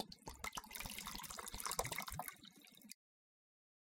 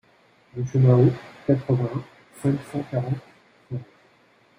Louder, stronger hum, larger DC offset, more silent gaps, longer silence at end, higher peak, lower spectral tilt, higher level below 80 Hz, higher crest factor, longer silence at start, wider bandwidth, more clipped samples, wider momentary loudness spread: second, -46 LUFS vs -23 LUFS; neither; neither; neither; first, 1 s vs 0.75 s; second, -20 dBFS vs -4 dBFS; second, -1.5 dB/octave vs -9.5 dB/octave; second, -64 dBFS vs -58 dBFS; first, 30 dB vs 20 dB; second, 0 s vs 0.55 s; first, 17 kHz vs 10.5 kHz; neither; about the same, 17 LU vs 18 LU